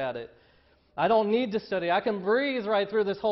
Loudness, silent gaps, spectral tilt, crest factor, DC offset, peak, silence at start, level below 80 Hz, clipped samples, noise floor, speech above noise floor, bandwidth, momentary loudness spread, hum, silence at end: -27 LUFS; none; -7.5 dB/octave; 16 dB; under 0.1%; -12 dBFS; 0 s; -66 dBFS; under 0.1%; -62 dBFS; 36 dB; 6 kHz; 12 LU; none; 0 s